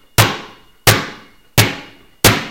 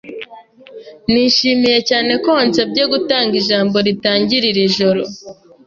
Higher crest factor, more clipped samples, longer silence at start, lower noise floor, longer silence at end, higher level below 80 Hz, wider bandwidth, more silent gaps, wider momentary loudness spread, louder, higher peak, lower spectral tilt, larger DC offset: about the same, 16 dB vs 14 dB; first, 0.2% vs under 0.1%; first, 0.2 s vs 0.05 s; about the same, -37 dBFS vs -40 dBFS; second, 0 s vs 0.35 s; first, -34 dBFS vs -54 dBFS; first, over 20 kHz vs 7.4 kHz; neither; first, 16 LU vs 13 LU; about the same, -14 LUFS vs -14 LUFS; about the same, 0 dBFS vs -2 dBFS; second, -3 dB/octave vs -4.5 dB/octave; neither